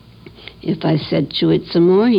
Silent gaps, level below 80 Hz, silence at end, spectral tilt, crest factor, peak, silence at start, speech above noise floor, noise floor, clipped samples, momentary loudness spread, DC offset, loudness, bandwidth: none; -48 dBFS; 0 s; -9 dB/octave; 12 dB; -4 dBFS; 0.25 s; 24 dB; -39 dBFS; under 0.1%; 18 LU; under 0.1%; -17 LUFS; 5.4 kHz